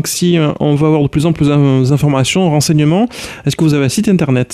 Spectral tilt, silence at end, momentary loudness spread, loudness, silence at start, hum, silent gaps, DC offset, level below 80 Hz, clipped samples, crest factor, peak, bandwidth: -6 dB/octave; 0 s; 3 LU; -12 LUFS; 0 s; none; none; under 0.1%; -40 dBFS; under 0.1%; 10 dB; -2 dBFS; 15.5 kHz